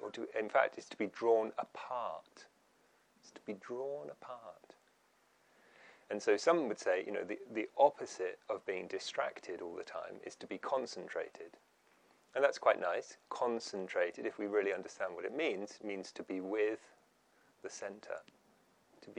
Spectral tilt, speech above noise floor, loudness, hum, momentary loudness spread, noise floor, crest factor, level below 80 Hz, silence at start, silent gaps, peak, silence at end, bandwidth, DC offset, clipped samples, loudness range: -3.5 dB/octave; 34 dB; -38 LUFS; none; 16 LU; -72 dBFS; 24 dB; under -90 dBFS; 0 s; none; -14 dBFS; 0 s; 10.5 kHz; under 0.1%; under 0.1%; 10 LU